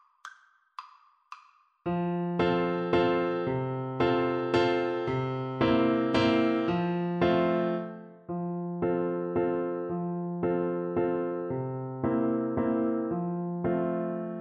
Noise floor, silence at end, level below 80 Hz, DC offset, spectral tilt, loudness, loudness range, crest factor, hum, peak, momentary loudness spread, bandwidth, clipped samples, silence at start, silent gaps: -60 dBFS; 0 s; -58 dBFS; under 0.1%; -8 dB/octave; -29 LUFS; 4 LU; 16 dB; none; -12 dBFS; 10 LU; 7.4 kHz; under 0.1%; 0.25 s; none